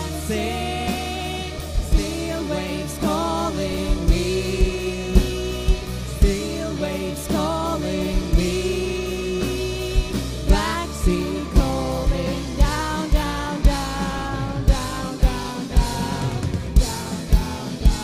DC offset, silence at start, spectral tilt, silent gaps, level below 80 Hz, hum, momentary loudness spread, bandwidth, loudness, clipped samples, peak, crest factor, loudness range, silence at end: under 0.1%; 0 s; -5.5 dB/octave; none; -24 dBFS; none; 5 LU; 15.5 kHz; -23 LUFS; under 0.1%; 0 dBFS; 20 dB; 1 LU; 0 s